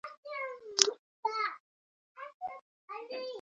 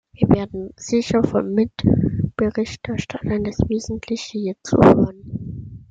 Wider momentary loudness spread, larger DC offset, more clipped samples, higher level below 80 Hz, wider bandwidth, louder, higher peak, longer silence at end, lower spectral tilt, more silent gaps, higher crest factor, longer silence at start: first, 22 LU vs 16 LU; neither; neither; second, -88 dBFS vs -40 dBFS; first, 8.8 kHz vs 7.8 kHz; second, -34 LUFS vs -20 LUFS; about the same, 0 dBFS vs 0 dBFS; about the same, 0 s vs 0.1 s; second, 2 dB/octave vs -7 dB/octave; first, 0.17-0.23 s, 0.99-1.23 s, 1.60-2.15 s, 2.34-2.40 s, 2.62-2.88 s vs none; first, 36 dB vs 18 dB; second, 0.05 s vs 0.2 s